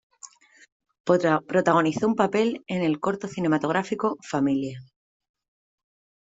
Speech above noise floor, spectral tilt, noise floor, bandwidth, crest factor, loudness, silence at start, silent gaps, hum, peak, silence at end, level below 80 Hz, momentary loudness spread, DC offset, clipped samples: 26 dB; -6.5 dB/octave; -50 dBFS; 8 kHz; 20 dB; -24 LUFS; 0.25 s; 0.72-0.80 s, 1.00-1.04 s; none; -6 dBFS; 1.4 s; -66 dBFS; 7 LU; under 0.1%; under 0.1%